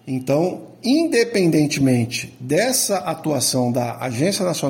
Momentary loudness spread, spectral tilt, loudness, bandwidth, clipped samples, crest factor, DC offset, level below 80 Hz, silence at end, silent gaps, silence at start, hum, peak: 7 LU; -4.5 dB/octave; -19 LUFS; 17 kHz; under 0.1%; 14 dB; under 0.1%; -58 dBFS; 0 s; none; 0.05 s; none; -4 dBFS